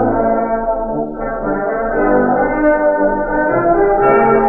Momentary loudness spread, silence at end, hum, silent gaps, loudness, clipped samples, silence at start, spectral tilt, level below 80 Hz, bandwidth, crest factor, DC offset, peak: 8 LU; 0 s; none; none; -15 LUFS; under 0.1%; 0 s; -11.5 dB/octave; -32 dBFS; 3.2 kHz; 12 dB; under 0.1%; 0 dBFS